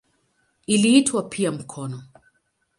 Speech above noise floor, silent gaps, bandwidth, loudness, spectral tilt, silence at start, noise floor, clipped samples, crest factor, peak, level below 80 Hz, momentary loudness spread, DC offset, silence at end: 48 dB; none; 11.5 kHz; -20 LUFS; -4 dB/octave; 0.7 s; -68 dBFS; under 0.1%; 20 dB; -4 dBFS; -66 dBFS; 20 LU; under 0.1%; 0.75 s